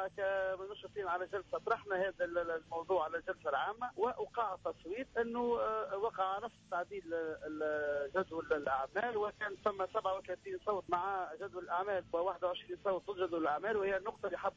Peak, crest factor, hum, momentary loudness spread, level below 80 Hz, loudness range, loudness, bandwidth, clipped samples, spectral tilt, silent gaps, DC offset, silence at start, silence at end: -24 dBFS; 14 dB; none; 6 LU; -68 dBFS; 1 LU; -38 LUFS; 7.8 kHz; under 0.1%; -5.5 dB/octave; none; under 0.1%; 0 s; 0.05 s